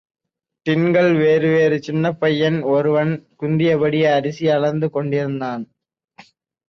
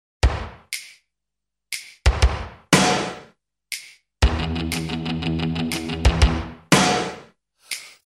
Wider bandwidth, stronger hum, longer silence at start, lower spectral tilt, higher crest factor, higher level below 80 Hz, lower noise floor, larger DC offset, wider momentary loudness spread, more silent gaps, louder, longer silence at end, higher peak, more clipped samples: second, 6.8 kHz vs 14.5 kHz; neither; first, 0.65 s vs 0.25 s; first, -7.5 dB/octave vs -4.5 dB/octave; second, 14 dB vs 22 dB; second, -60 dBFS vs -28 dBFS; second, -49 dBFS vs -85 dBFS; neither; second, 10 LU vs 15 LU; neither; first, -18 LUFS vs -22 LUFS; first, 1.05 s vs 0.15 s; second, -6 dBFS vs 0 dBFS; neither